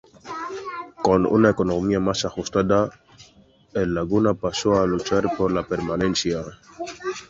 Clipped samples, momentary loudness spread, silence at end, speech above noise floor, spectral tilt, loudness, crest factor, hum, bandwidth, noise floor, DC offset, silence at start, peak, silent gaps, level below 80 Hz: under 0.1%; 14 LU; 0.05 s; 33 dB; -5.5 dB/octave; -22 LUFS; 20 dB; none; 7.8 kHz; -54 dBFS; under 0.1%; 0.25 s; -4 dBFS; none; -46 dBFS